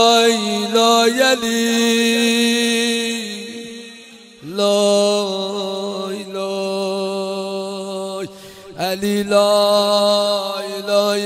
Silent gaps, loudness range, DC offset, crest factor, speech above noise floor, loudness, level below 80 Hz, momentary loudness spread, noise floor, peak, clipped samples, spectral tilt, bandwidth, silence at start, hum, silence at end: none; 8 LU; under 0.1%; 18 dB; 26 dB; -17 LUFS; -64 dBFS; 15 LU; -41 dBFS; 0 dBFS; under 0.1%; -3 dB/octave; 16 kHz; 0 s; none; 0 s